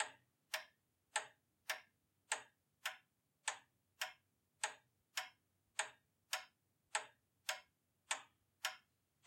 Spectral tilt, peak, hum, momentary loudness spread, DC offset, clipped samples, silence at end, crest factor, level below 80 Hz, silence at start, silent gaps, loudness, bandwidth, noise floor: 2.5 dB/octave; -24 dBFS; none; 13 LU; under 0.1%; under 0.1%; 0.5 s; 28 dB; under -90 dBFS; 0 s; none; -47 LUFS; 16.5 kHz; -78 dBFS